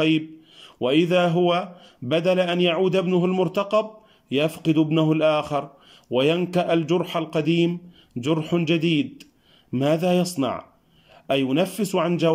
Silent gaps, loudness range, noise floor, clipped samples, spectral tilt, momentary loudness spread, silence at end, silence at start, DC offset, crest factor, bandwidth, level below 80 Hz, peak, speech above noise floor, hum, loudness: none; 3 LU; -54 dBFS; under 0.1%; -6.5 dB/octave; 10 LU; 0 s; 0 s; under 0.1%; 14 dB; 16 kHz; -66 dBFS; -8 dBFS; 33 dB; none; -22 LUFS